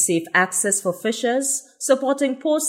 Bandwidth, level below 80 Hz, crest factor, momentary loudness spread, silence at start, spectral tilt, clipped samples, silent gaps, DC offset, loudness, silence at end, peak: 16 kHz; -80 dBFS; 18 dB; 5 LU; 0 s; -2.5 dB/octave; under 0.1%; none; under 0.1%; -20 LUFS; 0 s; -4 dBFS